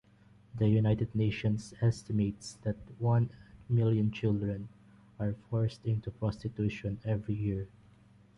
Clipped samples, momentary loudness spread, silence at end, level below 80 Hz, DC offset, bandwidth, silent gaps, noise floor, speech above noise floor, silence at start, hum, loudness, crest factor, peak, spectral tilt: under 0.1%; 10 LU; 0.7 s; -54 dBFS; under 0.1%; 10.5 kHz; none; -61 dBFS; 30 dB; 0.55 s; none; -33 LUFS; 16 dB; -16 dBFS; -8 dB/octave